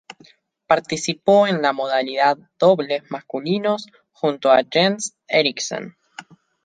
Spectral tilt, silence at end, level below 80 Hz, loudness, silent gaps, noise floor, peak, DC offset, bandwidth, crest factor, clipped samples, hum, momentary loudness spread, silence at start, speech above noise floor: -4 dB/octave; 0.4 s; -68 dBFS; -19 LUFS; none; -53 dBFS; -2 dBFS; under 0.1%; 9.6 kHz; 18 dB; under 0.1%; none; 11 LU; 0.1 s; 34 dB